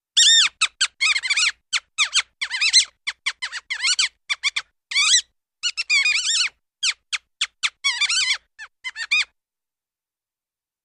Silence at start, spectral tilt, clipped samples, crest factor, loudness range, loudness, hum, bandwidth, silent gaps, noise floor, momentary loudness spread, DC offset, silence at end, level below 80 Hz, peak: 0.15 s; 6 dB/octave; under 0.1%; 18 dB; 4 LU; -19 LUFS; none; 15.5 kHz; none; under -90 dBFS; 12 LU; under 0.1%; 1.6 s; -68 dBFS; -4 dBFS